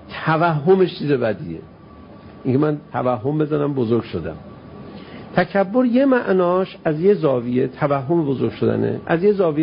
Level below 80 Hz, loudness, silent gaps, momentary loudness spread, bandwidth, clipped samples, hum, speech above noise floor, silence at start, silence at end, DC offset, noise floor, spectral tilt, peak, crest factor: -52 dBFS; -19 LUFS; none; 16 LU; 5.4 kHz; under 0.1%; none; 23 dB; 0 s; 0 s; under 0.1%; -41 dBFS; -12.5 dB/octave; -2 dBFS; 18 dB